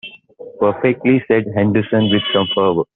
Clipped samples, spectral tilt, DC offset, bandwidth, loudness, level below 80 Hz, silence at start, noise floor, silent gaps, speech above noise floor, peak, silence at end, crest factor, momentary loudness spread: under 0.1%; -4.5 dB/octave; under 0.1%; 4.1 kHz; -16 LUFS; -54 dBFS; 0.05 s; -37 dBFS; none; 22 dB; -2 dBFS; 0.1 s; 14 dB; 4 LU